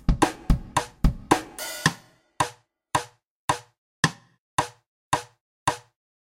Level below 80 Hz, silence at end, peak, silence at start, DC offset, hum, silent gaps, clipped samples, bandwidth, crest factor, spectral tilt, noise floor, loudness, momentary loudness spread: -32 dBFS; 0.4 s; -2 dBFS; 0.1 s; under 0.1%; none; 3.27-3.48 s, 3.78-4.03 s, 4.38-4.58 s, 4.86-5.11 s, 5.41-5.66 s; under 0.1%; 16.5 kHz; 26 dB; -4 dB/octave; -46 dBFS; -27 LUFS; 8 LU